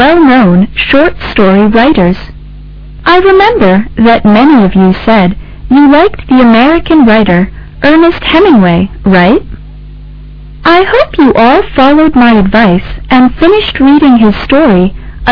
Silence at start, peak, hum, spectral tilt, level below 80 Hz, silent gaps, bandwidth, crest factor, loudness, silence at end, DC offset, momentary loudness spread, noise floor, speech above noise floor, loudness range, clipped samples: 0 s; 0 dBFS; none; -8.5 dB/octave; -24 dBFS; none; 5.4 kHz; 6 dB; -6 LUFS; 0 s; under 0.1%; 6 LU; -26 dBFS; 21 dB; 2 LU; 4%